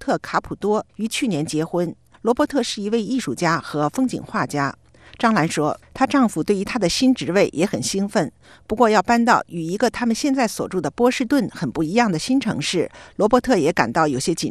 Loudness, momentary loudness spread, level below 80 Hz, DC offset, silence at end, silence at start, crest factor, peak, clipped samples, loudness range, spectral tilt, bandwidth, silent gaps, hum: -20 LUFS; 8 LU; -50 dBFS; 0.1%; 0 s; 0 s; 20 dB; 0 dBFS; under 0.1%; 3 LU; -5 dB/octave; 13.5 kHz; none; none